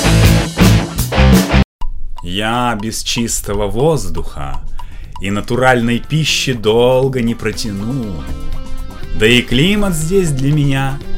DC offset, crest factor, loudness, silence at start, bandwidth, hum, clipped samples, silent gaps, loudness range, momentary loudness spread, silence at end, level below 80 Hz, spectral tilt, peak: under 0.1%; 14 dB; -14 LUFS; 0 s; 16.5 kHz; none; under 0.1%; 1.65-1.79 s; 4 LU; 18 LU; 0 s; -22 dBFS; -5 dB/octave; 0 dBFS